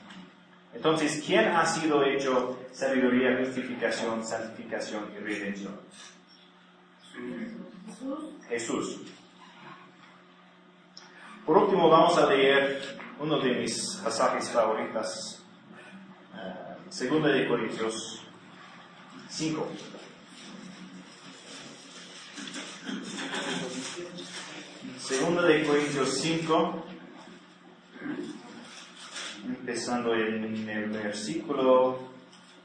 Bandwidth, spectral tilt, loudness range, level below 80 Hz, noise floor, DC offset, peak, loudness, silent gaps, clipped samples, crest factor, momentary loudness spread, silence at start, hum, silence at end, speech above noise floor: 10.5 kHz; -4 dB/octave; 14 LU; -76 dBFS; -57 dBFS; under 0.1%; -6 dBFS; -28 LUFS; none; under 0.1%; 24 dB; 24 LU; 0 s; none; 0.05 s; 29 dB